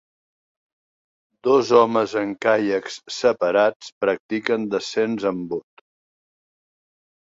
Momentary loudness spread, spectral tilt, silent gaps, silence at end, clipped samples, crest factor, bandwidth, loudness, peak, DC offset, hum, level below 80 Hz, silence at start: 11 LU; -4.5 dB/octave; 3.76-3.80 s, 3.92-4.01 s, 4.20-4.29 s; 1.8 s; under 0.1%; 20 dB; 7.8 kHz; -21 LUFS; -2 dBFS; under 0.1%; none; -66 dBFS; 1.45 s